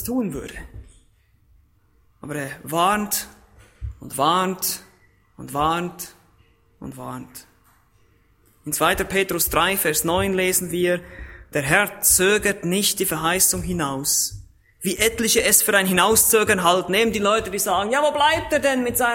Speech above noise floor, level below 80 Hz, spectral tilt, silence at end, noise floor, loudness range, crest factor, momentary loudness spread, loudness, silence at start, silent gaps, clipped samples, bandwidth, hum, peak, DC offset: 39 dB; -44 dBFS; -2.5 dB/octave; 0 s; -60 dBFS; 11 LU; 20 dB; 20 LU; -19 LUFS; 0 s; none; under 0.1%; 16.5 kHz; none; -2 dBFS; under 0.1%